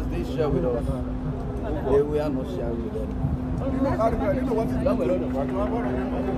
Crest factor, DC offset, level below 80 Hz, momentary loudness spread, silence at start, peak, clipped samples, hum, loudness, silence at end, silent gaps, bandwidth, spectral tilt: 16 dB; under 0.1%; -34 dBFS; 6 LU; 0 s; -10 dBFS; under 0.1%; none; -26 LUFS; 0 s; none; 13 kHz; -9 dB/octave